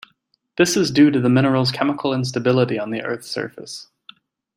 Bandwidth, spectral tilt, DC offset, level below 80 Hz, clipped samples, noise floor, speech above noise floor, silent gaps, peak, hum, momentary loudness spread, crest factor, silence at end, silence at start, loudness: 16 kHz; -5.5 dB/octave; under 0.1%; -62 dBFS; under 0.1%; -65 dBFS; 47 dB; none; -2 dBFS; none; 17 LU; 18 dB; 0.75 s; 0.6 s; -19 LUFS